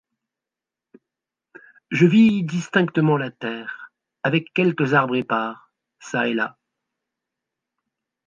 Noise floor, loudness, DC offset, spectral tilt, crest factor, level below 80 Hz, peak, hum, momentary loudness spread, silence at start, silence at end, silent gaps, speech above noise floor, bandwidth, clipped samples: -88 dBFS; -21 LUFS; under 0.1%; -7 dB/octave; 20 dB; -70 dBFS; -4 dBFS; none; 13 LU; 1.9 s; 1.75 s; none; 68 dB; 7.4 kHz; under 0.1%